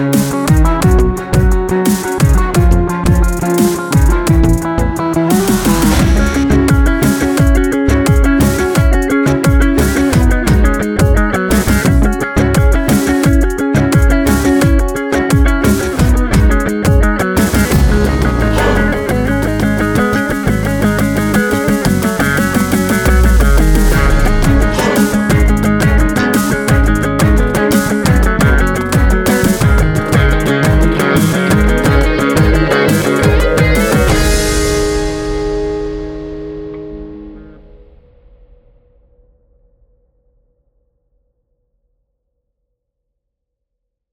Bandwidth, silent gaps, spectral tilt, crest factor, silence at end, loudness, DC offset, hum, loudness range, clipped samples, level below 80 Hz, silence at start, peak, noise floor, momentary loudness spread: 19.5 kHz; none; -6 dB/octave; 12 dB; 6.65 s; -12 LUFS; under 0.1%; none; 2 LU; under 0.1%; -16 dBFS; 0 s; 0 dBFS; -75 dBFS; 3 LU